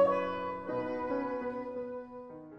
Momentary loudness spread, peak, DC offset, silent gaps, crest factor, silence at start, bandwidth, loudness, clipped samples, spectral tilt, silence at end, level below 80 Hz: 11 LU; -16 dBFS; under 0.1%; none; 20 dB; 0 s; 6.4 kHz; -36 LUFS; under 0.1%; -7.5 dB/octave; 0 s; -66 dBFS